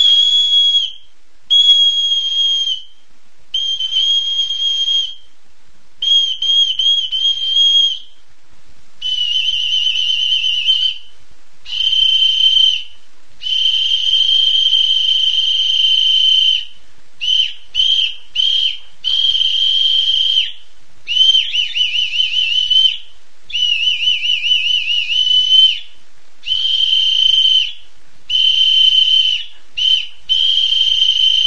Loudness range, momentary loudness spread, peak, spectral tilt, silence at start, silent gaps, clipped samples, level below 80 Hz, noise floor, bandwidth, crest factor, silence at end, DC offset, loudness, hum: 4 LU; 9 LU; 0 dBFS; 3.5 dB/octave; 0 s; none; under 0.1%; -52 dBFS; -54 dBFS; 10 kHz; 14 dB; 0 s; 5%; -11 LUFS; none